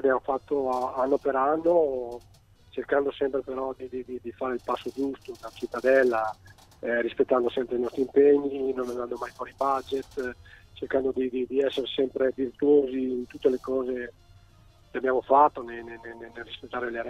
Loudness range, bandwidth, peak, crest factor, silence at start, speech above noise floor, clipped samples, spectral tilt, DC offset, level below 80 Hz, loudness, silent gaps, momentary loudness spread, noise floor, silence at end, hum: 4 LU; 12 kHz; -6 dBFS; 20 dB; 0 s; 29 dB; under 0.1%; -6 dB/octave; under 0.1%; -58 dBFS; -27 LUFS; none; 17 LU; -56 dBFS; 0 s; none